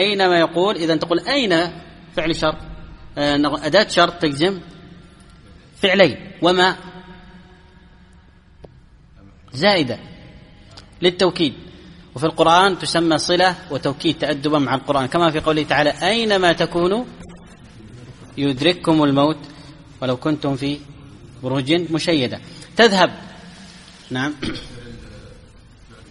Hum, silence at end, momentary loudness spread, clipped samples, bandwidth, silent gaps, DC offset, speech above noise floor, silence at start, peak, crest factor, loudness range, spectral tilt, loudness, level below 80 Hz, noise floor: none; 0.75 s; 19 LU; under 0.1%; 11.5 kHz; none; under 0.1%; 30 dB; 0 s; 0 dBFS; 20 dB; 5 LU; -5 dB/octave; -18 LUFS; -46 dBFS; -48 dBFS